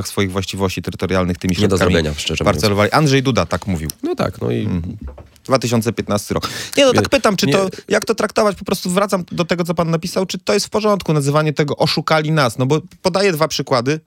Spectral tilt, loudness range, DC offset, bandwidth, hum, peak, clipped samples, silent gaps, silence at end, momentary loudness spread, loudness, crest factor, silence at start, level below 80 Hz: -5 dB/octave; 2 LU; under 0.1%; 17 kHz; none; 0 dBFS; under 0.1%; none; 0.1 s; 7 LU; -17 LUFS; 16 dB; 0 s; -42 dBFS